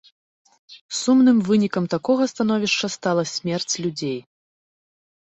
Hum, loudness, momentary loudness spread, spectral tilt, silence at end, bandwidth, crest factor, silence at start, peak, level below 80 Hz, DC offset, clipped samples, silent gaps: none; -21 LUFS; 11 LU; -4.5 dB/octave; 1.1 s; 8.2 kHz; 16 dB; 0.7 s; -8 dBFS; -64 dBFS; under 0.1%; under 0.1%; 0.81-0.89 s